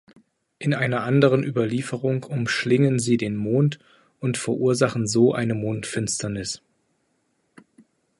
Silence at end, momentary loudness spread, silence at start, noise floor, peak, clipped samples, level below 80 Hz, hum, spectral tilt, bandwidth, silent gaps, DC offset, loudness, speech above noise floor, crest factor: 1.65 s; 9 LU; 0.6 s; -70 dBFS; -4 dBFS; under 0.1%; -58 dBFS; none; -5.5 dB/octave; 11.5 kHz; none; under 0.1%; -23 LUFS; 48 dB; 20 dB